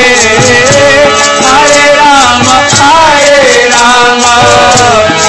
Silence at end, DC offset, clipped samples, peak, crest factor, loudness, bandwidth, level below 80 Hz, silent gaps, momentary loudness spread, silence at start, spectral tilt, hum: 0 s; 2%; 10%; 0 dBFS; 4 dB; -3 LUFS; 11 kHz; -32 dBFS; none; 1 LU; 0 s; -2 dB/octave; none